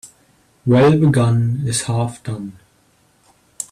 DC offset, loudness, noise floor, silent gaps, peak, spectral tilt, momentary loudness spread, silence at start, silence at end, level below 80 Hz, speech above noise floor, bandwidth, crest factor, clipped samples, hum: under 0.1%; -16 LUFS; -57 dBFS; none; -4 dBFS; -6.5 dB/octave; 17 LU; 0.05 s; 0.1 s; -50 dBFS; 42 dB; 13.5 kHz; 14 dB; under 0.1%; none